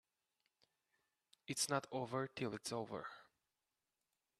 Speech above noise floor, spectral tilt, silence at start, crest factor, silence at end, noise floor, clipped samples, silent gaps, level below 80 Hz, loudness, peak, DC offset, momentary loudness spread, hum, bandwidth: over 47 dB; -3.5 dB/octave; 1.5 s; 24 dB; 1.15 s; under -90 dBFS; under 0.1%; none; -84 dBFS; -43 LUFS; -22 dBFS; under 0.1%; 15 LU; none; 13.5 kHz